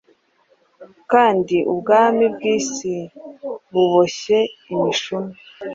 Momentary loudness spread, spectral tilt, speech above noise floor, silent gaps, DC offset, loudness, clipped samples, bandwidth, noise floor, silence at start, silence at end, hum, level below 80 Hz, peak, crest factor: 17 LU; -4.5 dB/octave; 42 dB; none; under 0.1%; -18 LUFS; under 0.1%; 7.8 kHz; -60 dBFS; 0.8 s; 0 s; none; -64 dBFS; -2 dBFS; 18 dB